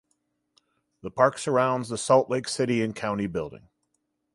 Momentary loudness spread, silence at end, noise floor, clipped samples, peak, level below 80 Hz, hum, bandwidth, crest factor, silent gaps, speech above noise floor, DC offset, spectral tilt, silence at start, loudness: 13 LU; 0.75 s; -77 dBFS; under 0.1%; -4 dBFS; -60 dBFS; none; 11.5 kHz; 22 dB; none; 52 dB; under 0.1%; -5 dB/octave; 1.05 s; -25 LUFS